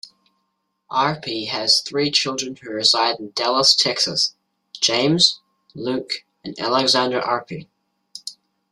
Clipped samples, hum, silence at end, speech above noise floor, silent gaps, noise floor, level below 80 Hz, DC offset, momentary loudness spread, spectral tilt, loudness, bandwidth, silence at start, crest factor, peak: under 0.1%; none; 0.4 s; 53 dB; none; -73 dBFS; -64 dBFS; under 0.1%; 19 LU; -2.5 dB/octave; -18 LUFS; 14 kHz; 0.9 s; 20 dB; -2 dBFS